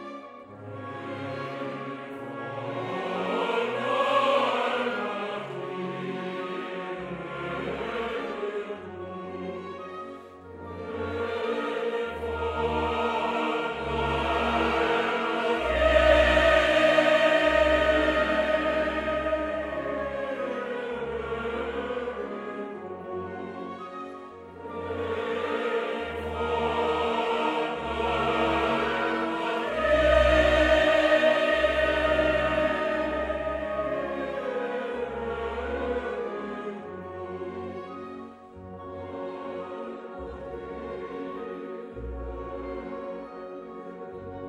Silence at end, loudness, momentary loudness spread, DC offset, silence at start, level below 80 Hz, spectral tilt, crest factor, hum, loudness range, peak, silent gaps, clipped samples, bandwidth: 0 s; -27 LUFS; 18 LU; under 0.1%; 0 s; -42 dBFS; -5.5 dB/octave; 20 dB; none; 15 LU; -8 dBFS; none; under 0.1%; 12 kHz